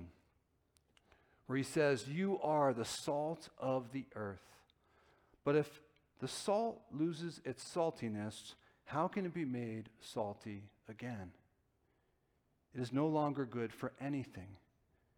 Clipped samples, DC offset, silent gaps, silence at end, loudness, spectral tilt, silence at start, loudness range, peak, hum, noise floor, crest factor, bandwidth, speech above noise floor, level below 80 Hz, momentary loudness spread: under 0.1%; under 0.1%; none; 0.6 s; -40 LUFS; -6 dB/octave; 0 s; 6 LU; -22 dBFS; none; -79 dBFS; 18 dB; 19.5 kHz; 40 dB; -76 dBFS; 17 LU